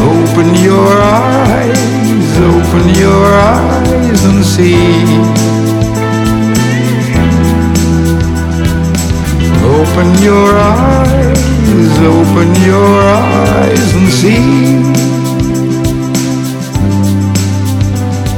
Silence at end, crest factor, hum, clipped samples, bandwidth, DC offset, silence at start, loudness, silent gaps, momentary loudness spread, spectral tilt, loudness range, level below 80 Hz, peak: 0 s; 8 dB; none; 1%; 18 kHz; under 0.1%; 0 s; -8 LUFS; none; 6 LU; -6 dB/octave; 3 LU; -20 dBFS; 0 dBFS